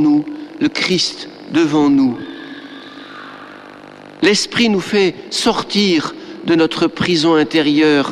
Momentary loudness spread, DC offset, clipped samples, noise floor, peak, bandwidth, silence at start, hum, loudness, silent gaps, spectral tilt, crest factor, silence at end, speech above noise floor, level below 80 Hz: 20 LU; under 0.1%; under 0.1%; -37 dBFS; -2 dBFS; 12.5 kHz; 0 s; 50 Hz at -45 dBFS; -15 LUFS; none; -4.5 dB/octave; 14 dB; 0 s; 22 dB; -52 dBFS